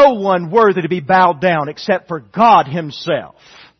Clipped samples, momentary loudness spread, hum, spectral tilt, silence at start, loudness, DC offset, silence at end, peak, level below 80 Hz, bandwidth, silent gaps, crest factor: under 0.1%; 11 LU; none; -6.5 dB/octave; 0 s; -14 LUFS; under 0.1%; 0.55 s; 0 dBFS; -56 dBFS; 6.4 kHz; none; 14 dB